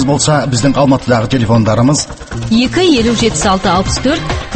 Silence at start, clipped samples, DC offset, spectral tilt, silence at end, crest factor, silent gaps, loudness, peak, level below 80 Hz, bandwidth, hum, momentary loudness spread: 0 s; under 0.1%; under 0.1%; -5 dB/octave; 0 s; 12 dB; none; -11 LUFS; 0 dBFS; -28 dBFS; 8.8 kHz; none; 5 LU